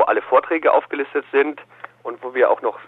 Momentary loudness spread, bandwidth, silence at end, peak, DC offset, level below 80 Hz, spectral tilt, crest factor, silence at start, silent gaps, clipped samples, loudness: 16 LU; 4.1 kHz; 0.05 s; -2 dBFS; under 0.1%; -72 dBFS; -6.5 dB/octave; 16 dB; 0 s; none; under 0.1%; -19 LUFS